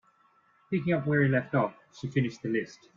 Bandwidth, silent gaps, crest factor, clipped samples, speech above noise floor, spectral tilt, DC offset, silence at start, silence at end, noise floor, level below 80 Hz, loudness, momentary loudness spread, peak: 7.4 kHz; none; 18 dB; under 0.1%; 37 dB; -8 dB/octave; under 0.1%; 0.7 s; 0.2 s; -65 dBFS; -66 dBFS; -29 LUFS; 8 LU; -12 dBFS